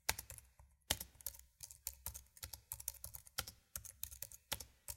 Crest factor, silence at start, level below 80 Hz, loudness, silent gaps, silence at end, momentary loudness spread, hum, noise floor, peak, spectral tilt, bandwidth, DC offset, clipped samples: 34 dB; 0.1 s; -62 dBFS; -47 LUFS; none; 0 s; 10 LU; none; -68 dBFS; -14 dBFS; -0.5 dB/octave; 17 kHz; under 0.1%; under 0.1%